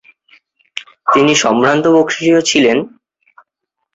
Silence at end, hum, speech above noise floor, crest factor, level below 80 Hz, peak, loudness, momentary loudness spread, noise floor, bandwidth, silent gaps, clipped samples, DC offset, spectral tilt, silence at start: 1.05 s; none; 64 dB; 14 dB; -56 dBFS; 0 dBFS; -12 LUFS; 18 LU; -75 dBFS; 8 kHz; none; under 0.1%; under 0.1%; -3.5 dB/octave; 0.75 s